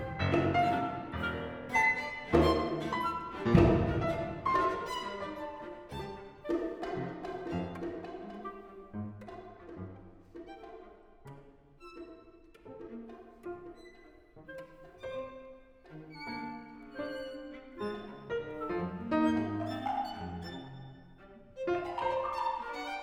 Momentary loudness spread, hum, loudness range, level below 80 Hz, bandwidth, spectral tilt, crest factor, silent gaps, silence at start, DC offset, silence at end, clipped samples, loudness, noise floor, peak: 23 LU; none; 20 LU; -50 dBFS; 15.5 kHz; -7 dB/octave; 26 dB; none; 0 s; under 0.1%; 0 s; under 0.1%; -34 LUFS; -57 dBFS; -8 dBFS